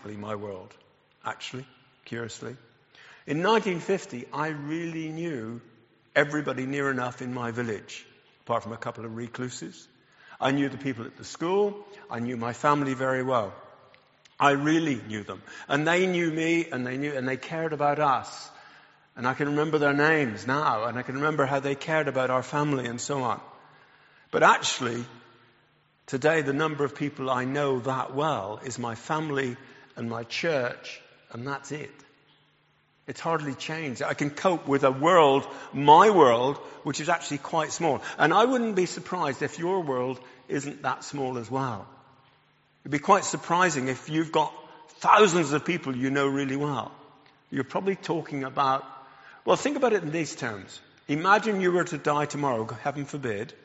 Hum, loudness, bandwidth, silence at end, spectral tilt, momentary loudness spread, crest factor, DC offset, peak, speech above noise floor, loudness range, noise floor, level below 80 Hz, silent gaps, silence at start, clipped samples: none; -26 LUFS; 8 kHz; 0.15 s; -4 dB/octave; 16 LU; 24 dB; under 0.1%; -4 dBFS; 40 dB; 10 LU; -66 dBFS; -70 dBFS; none; 0.05 s; under 0.1%